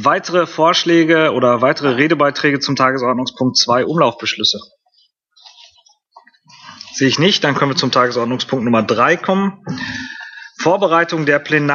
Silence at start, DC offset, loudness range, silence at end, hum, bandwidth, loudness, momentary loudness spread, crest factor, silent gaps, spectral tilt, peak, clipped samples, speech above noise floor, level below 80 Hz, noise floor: 0 s; under 0.1%; 6 LU; 0 s; none; 7.4 kHz; -15 LUFS; 11 LU; 16 dB; none; -4.5 dB/octave; 0 dBFS; under 0.1%; 44 dB; -60 dBFS; -59 dBFS